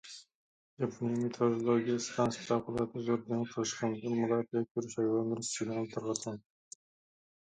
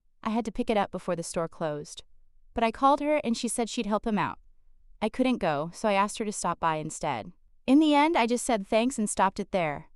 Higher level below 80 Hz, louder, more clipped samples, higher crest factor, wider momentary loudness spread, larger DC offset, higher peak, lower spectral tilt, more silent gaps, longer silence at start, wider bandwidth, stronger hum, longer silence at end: second, -70 dBFS vs -54 dBFS; second, -34 LUFS vs -27 LUFS; neither; about the same, 20 dB vs 18 dB; first, 15 LU vs 11 LU; neither; second, -14 dBFS vs -10 dBFS; about the same, -5.5 dB/octave vs -4.5 dB/octave; first, 0.35-0.77 s, 4.71-4.75 s vs none; second, 0.05 s vs 0.25 s; second, 9.6 kHz vs 13.5 kHz; neither; first, 1 s vs 0.15 s